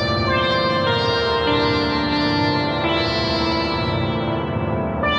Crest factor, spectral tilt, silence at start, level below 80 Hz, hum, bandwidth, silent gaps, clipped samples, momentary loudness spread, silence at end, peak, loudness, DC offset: 12 dB; -6.5 dB/octave; 0 s; -38 dBFS; none; 9.4 kHz; none; under 0.1%; 4 LU; 0 s; -6 dBFS; -19 LUFS; under 0.1%